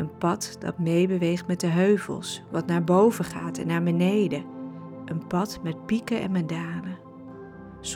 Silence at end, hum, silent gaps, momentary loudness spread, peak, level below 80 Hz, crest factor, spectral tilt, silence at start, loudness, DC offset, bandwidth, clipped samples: 0 s; none; none; 17 LU; -10 dBFS; -60 dBFS; 16 dB; -6.5 dB/octave; 0 s; -26 LUFS; under 0.1%; 15 kHz; under 0.1%